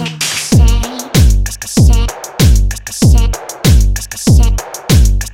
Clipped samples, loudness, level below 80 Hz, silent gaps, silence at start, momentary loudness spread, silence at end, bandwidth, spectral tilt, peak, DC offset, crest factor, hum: under 0.1%; -12 LUFS; -12 dBFS; none; 0 s; 6 LU; 0 s; 16.5 kHz; -5 dB/octave; 0 dBFS; under 0.1%; 10 dB; none